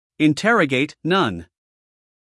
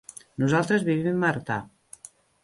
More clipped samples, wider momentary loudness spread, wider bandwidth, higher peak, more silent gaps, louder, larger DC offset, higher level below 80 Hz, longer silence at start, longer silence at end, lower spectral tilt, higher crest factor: neither; second, 7 LU vs 23 LU; about the same, 12 kHz vs 11.5 kHz; first, -4 dBFS vs -10 dBFS; neither; first, -19 LUFS vs -25 LUFS; neither; about the same, -62 dBFS vs -60 dBFS; second, 0.2 s vs 0.4 s; about the same, 0.85 s vs 0.75 s; about the same, -5.5 dB/octave vs -6.5 dB/octave; about the same, 18 dB vs 18 dB